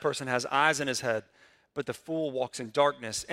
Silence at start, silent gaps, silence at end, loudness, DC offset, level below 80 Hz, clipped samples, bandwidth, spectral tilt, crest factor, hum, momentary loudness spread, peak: 0 s; none; 0 s; -29 LUFS; under 0.1%; -68 dBFS; under 0.1%; 16 kHz; -3 dB/octave; 20 dB; none; 11 LU; -10 dBFS